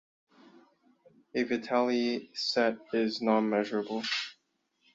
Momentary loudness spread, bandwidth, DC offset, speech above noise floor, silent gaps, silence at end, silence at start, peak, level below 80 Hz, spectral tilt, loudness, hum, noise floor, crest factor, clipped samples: 6 LU; 7.8 kHz; under 0.1%; 46 dB; none; 0.6 s; 1.35 s; -12 dBFS; -76 dBFS; -4.5 dB/octave; -30 LUFS; none; -76 dBFS; 20 dB; under 0.1%